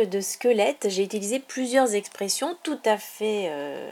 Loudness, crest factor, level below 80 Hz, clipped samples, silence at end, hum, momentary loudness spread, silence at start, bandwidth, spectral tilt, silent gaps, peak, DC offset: -25 LUFS; 18 dB; -84 dBFS; under 0.1%; 0 s; none; 7 LU; 0 s; 18 kHz; -3 dB/octave; none; -8 dBFS; under 0.1%